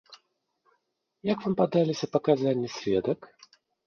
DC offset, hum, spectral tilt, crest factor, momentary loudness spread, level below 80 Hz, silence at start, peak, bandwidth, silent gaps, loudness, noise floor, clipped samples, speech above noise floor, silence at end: under 0.1%; none; -7 dB/octave; 20 dB; 8 LU; -66 dBFS; 0.1 s; -8 dBFS; 7.2 kHz; none; -27 LUFS; -77 dBFS; under 0.1%; 51 dB; 0.6 s